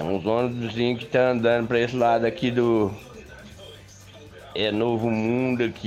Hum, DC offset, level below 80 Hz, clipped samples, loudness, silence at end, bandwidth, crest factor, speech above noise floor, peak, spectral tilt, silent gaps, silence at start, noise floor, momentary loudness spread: none; under 0.1%; -54 dBFS; under 0.1%; -23 LUFS; 0 s; 13.5 kHz; 16 dB; 23 dB; -8 dBFS; -7 dB/octave; none; 0 s; -46 dBFS; 22 LU